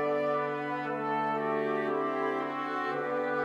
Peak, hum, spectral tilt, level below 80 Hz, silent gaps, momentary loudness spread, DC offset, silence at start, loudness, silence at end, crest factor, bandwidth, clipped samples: -18 dBFS; none; -7 dB/octave; -80 dBFS; none; 3 LU; under 0.1%; 0 s; -31 LUFS; 0 s; 14 dB; 9.8 kHz; under 0.1%